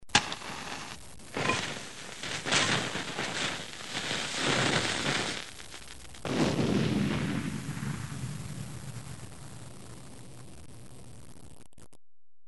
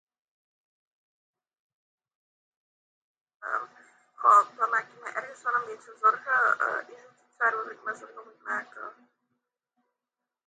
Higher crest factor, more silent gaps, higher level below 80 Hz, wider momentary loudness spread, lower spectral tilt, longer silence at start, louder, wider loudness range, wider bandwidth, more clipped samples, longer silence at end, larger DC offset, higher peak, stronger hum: about the same, 26 dB vs 24 dB; neither; first, -56 dBFS vs under -90 dBFS; about the same, 22 LU vs 21 LU; first, -3.5 dB/octave vs -2 dB/octave; second, 0 s vs 3.4 s; second, -31 LUFS vs -27 LUFS; first, 16 LU vs 11 LU; first, 11.5 kHz vs 9 kHz; neither; second, 0 s vs 1.55 s; first, 0.5% vs under 0.1%; about the same, -8 dBFS vs -8 dBFS; neither